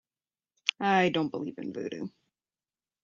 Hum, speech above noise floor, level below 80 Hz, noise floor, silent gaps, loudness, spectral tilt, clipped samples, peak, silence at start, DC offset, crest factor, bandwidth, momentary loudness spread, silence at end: none; over 61 dB; -76 dBFS; under -90 dBFS; none; -30 LUFS; -5 dB/octave; under 0.1%; -6 dBFS; 0.65 s; under 0.1%; 26 dB; 7.6 kHz; 13 LU; 0.95 s